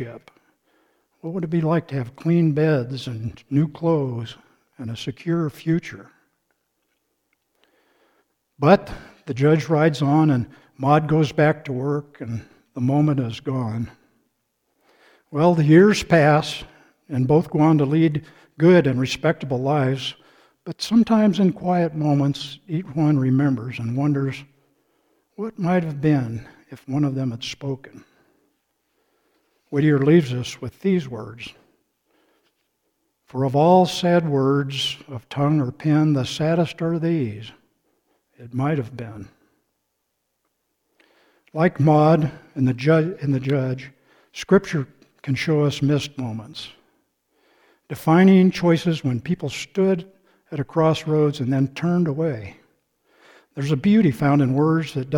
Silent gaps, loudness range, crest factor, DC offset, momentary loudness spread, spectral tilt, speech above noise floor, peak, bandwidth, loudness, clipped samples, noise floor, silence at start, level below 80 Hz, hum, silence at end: none; 8 LU; 20 dB; under 0.1%; 17 LU; -7.5 dB/octave; 55 dB; -2 dBFS; 15.5 kHz; -20 LUFS; under 0.1%; -75 dBFS; 0 s; -56 dBFS; none; 0 s